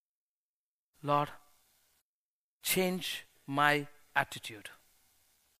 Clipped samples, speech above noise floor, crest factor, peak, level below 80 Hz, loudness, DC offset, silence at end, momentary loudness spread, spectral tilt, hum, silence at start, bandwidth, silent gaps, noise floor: under 0.1%; over 58 dB; 26 dB; -10 dBFS; -72 dBFS; -33 LUFS; under 0.1%; 0.85 s; 15 LU; -3.5 dB/octave; none; 1.05 s; 15.5 kHz; 2.01-2.60 s; under -90 dBFS